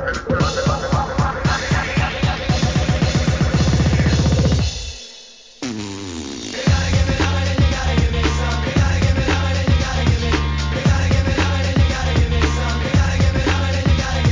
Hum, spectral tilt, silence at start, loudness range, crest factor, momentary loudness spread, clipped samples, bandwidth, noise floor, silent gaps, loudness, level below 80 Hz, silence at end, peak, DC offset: none; -5.5 dB/octave; 0 s; 3 LU; 14 dB; 10 LU; under 0.1%; 7.6 kHz; -41 dBFS; none; -18 LUFS; -22 dBFS; 0 s; -4 dBFS; 0.2%